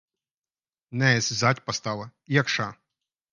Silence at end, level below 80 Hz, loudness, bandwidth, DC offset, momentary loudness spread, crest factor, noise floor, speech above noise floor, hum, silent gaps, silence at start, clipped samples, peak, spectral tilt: 0.6 s; -64 dBFS; -25 LUFS; 10 kHz; under 0.1%; 13 LU; 22 dB; under -90 dBFS; over 65 dB; none; none; 0.9 s; under 0.1%; -4 dBFS; -4 dB/octave